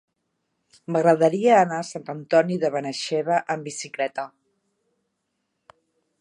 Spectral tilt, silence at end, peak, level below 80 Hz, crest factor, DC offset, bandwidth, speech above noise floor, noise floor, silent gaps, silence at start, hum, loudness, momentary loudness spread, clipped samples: -5 dB/octave; 1.95 s; -4 dBFS; -78 dBFS; 20 dB; under 0.1%; 11 kHz; 55 dB; -77 dBFS; none; 0.9 s; none; -22 LUFS; 15 LU; under 0.1%